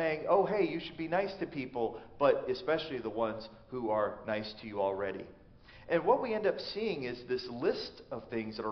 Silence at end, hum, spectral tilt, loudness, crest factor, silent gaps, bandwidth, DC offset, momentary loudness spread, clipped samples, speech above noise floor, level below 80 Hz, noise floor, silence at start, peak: 0 s; none; -3.5 dB/octave; -34 LUFS; 20 dB; none; 6.2 kHz; under 0.1%; 11 LU; under 0.1%; 22 dB; -64 dBFS; -56 dBFS; 0 s; -14 dBFS